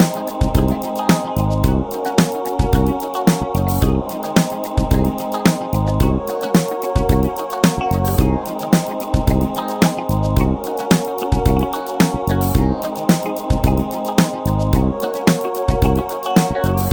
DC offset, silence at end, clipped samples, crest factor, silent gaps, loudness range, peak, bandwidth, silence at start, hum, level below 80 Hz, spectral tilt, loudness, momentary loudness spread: under 0.1%; 0 s; under 0.1%; 16 dB; none; 1 LU; 0 dBFS; over 20 kHz; 0 s; none; -24 dBFS; -6 dB/octave; -18 LUFS; 4 LU